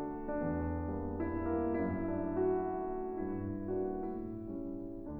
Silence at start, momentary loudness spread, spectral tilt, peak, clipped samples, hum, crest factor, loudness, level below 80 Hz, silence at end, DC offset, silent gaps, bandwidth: 0 s; 8 LU; -12.5 dB/octave; -24 dBFS; under 0.1%; none; 14 dB; -37 LUFS; -50 dBFS; 0 s; under 0.1%; none; 2.8 kHz